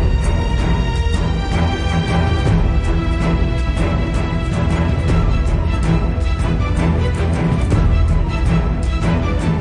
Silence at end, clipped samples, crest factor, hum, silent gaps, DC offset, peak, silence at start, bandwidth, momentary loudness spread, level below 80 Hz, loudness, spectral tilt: 0 s; under 0.1%; 12 dB; none; none; under 0.1%; -2 dBFS; 0 s; 10.5 kHz; 3 LU; -18 dBFS; -18 LUFS; -7 dB/octave